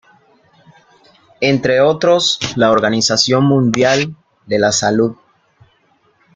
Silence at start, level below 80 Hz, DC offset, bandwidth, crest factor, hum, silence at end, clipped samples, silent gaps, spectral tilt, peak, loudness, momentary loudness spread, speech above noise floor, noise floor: 1.4 s; -52 dBFS; under 0.1%; 9.6 kHz; 14 dB; none; 1.2 s; under 0.1%; none; -4 dB/octave; 0 dBFS; -14 LUFS; 5 LU; 43 dB; -57 dBFS